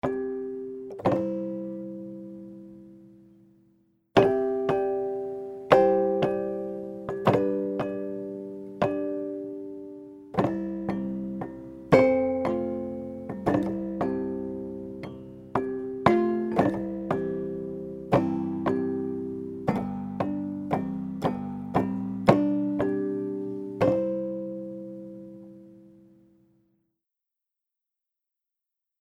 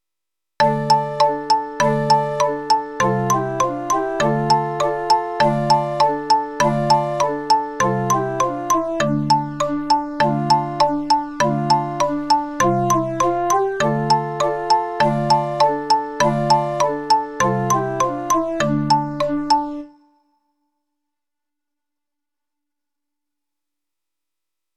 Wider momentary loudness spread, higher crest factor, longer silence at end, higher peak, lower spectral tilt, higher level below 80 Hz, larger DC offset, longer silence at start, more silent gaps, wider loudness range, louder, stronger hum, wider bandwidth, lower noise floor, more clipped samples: first, 16 LU vs 4 LU; first, 26 dB vs 16 dB; second, 3.15 s vs 4.9 s; about the same, -2 dBFS vs -2 dBFS; first, -8 dB/octave vs -5 dB/octave; second, -58 dBFS vs -52 dBFS; neither; second, 0.05 s vs 0.6 s; neither; first, 7 LU vs 3 LU; second, -28 LUFS vs -19 LUFS; neither; second, 11 kHz vs 14 kHz; about the same, -87 dBFS vs -87 dBFS; neither